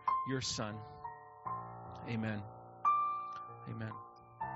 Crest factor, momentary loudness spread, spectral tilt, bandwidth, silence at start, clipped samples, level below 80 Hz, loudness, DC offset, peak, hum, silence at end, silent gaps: 18 dB; 16 LU; -4 dB/octave; 7.4 kHz; 0 s; under 0.1%; -68 dBFS; -39 LUFS; under 0.1%; -20 dBFS; none; 0 s; none